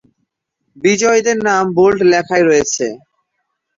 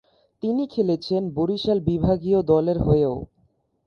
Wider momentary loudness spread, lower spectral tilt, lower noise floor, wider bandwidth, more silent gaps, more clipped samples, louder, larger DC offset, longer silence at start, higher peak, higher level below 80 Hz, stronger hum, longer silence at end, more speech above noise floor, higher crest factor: about the same, 7 LU vs 6 LU; second, -4 dB/octave vs -9.5 dB/octave; first, -71 dBFS vs -65 dBFS; first, 7.8 kHz vs 6.8 kHz; neither; neither; first, -13 LUFS vs -22 LUFS; neither; first, 0.85 s vs 0.45 s; first, -2 dBFS vs -6 dBFS; second, -52 dBFS vs -42 dBFS; neither; first, 0.8 s vs 0.6 s; first, 58 dB vs 44 dB; about the same, 14 dB vs 16 dB